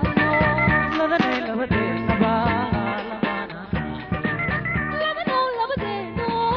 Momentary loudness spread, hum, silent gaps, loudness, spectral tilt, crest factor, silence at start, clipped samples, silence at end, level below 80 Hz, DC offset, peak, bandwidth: 9 LU; none; none; -22 LUFS; -4.5 dB/octave; 18 dB; 0 s; under 0.1%; 0 s; -38 dBFS; under 0.1%; -4 dBFS; 6.6 kHz